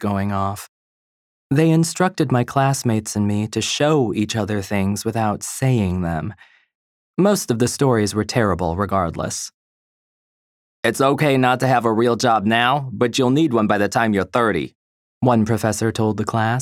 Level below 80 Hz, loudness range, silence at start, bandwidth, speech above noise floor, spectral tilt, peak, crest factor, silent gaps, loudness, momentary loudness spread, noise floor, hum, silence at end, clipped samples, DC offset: -50 dBFS; 4 LU; 0 s; 16.5 kHz; over 72 dB; -5.5 dB/octave; -2 dBFS; 18 dB; 0.69-1.50 s, 6.75-7.14 s, 9.54-10.83 s, 14.75-15.21 s; -19 LUFS; 7 LU; under -90 dBFS; none; 0 s; under 0.1%; under 0.1%